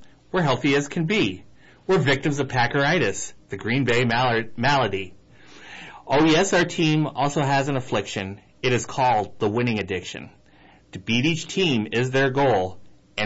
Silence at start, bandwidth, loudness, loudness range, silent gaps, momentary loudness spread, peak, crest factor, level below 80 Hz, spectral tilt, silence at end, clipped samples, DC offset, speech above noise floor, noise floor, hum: 0 s; 8 kHz; -22 LUFS; 3 LU; none; 15 LU; -10 dBFS; 12 dB; -52 dBFS; -5 dB/octave; 0 s; under 0.1%; under 0.1%; 31 dB; -53 dBFS; none